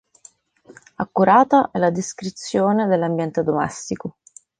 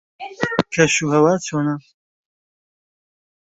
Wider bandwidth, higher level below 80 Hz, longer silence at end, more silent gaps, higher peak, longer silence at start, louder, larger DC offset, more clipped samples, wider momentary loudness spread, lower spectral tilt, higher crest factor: first, 10 kHz vs 8.2 kHz; about the same, -58 dBFS vs -58 dBFS; second, 0.5 s vs 1.8 s; neither; about the same, -2 dBFS vs -2 dBFS; first, 0.7 s vs 0.2 s; about the same, -19 LUFS vs -18 LUFS; neither; neither; first, 15 LU vs 12 LU; first, -6 dB/octave vs -4.5 dB/octave; about the same, 18 dB vs 20 dB